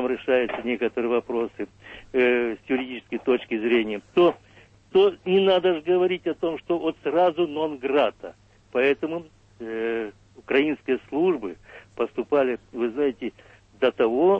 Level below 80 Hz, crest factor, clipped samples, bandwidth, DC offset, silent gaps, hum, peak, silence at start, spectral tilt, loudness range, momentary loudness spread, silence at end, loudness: -60 dBFS; 16 dB; under 0.1%; 5.6 kHz; under 0.1%; none; none; -8 dBFS; 0 s; -7 dB/octave; 4 LU; 14 LU; 0 s; -24 LUFS